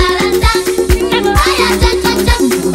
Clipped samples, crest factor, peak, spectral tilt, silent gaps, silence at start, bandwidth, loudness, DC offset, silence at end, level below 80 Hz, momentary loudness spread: under 0.1%; 10 dB; 0 dBFS; -4.5 dB/octave; none; 0 s; 16.5 kHz; -11 LUFS; under 0.1%; 0 s; -18 dBFS; 2 LU